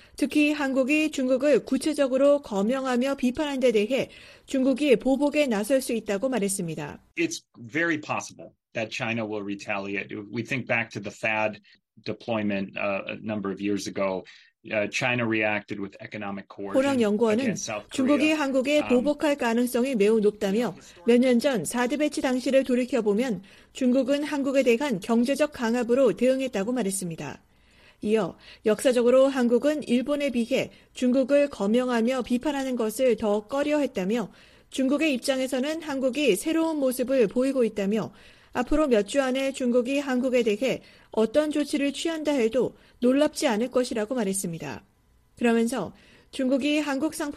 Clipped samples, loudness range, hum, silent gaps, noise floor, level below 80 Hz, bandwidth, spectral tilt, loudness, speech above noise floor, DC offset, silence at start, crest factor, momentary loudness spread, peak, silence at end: under 0.1%; 5 LU; none; none; -58 dBFS; -54 dBFS; 15 kHz; -4.5 dB/octave; -25 LUFS; 33 dB; under 0.1%; 0.2 s; 18 dB; 10 LU; -8 dBFS; 0 s